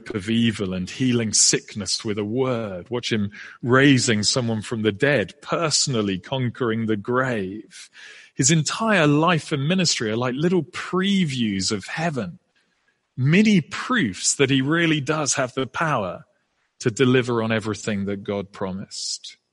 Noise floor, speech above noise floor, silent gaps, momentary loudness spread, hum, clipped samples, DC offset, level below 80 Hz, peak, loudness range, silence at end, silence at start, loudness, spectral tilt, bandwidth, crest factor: -69 dBFS; 47 dB; none; 12 LU; none; under 0.1%; under 0.1%; -60 dBFS; -2 dBFS; 4 LU; 0.2 s; 0.05 s; -21 LUFS; -4 dB/octave; 11.5 kHz; 20 dB